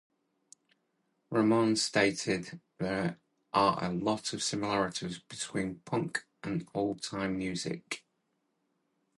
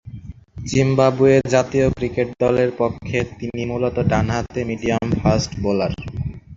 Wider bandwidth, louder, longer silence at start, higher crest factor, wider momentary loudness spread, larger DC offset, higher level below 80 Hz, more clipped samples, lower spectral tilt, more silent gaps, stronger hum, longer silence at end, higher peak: first, 11.5 kHz vs 7.8 kHz; second, -32 LUFS vs -19 LUFS; first, 1.3 s vs 0.05 s; about the same, 22 dB vs 18 dB; about the same, 11 LU vs 12 LU; neither; second, -64 dBFS vs -36 dBFS; neither; second, -4.5 dB/octave vs -6.5 dB/octave; neither; neither; first, 1.2 s vs 0 s; second, -10 dBFS vs -2 dBFS